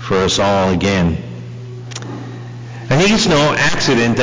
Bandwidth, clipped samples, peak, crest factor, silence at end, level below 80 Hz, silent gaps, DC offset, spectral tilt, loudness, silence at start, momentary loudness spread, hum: 7.8 kHz; under 0.1%; -4 dBFS; 10 dB; 0 s; -36 dBFS; none; under 0.1%; -4.5 dB/octave; -14 LUFS; 0 s; 18 LU; 60 Hz at -30 dBFS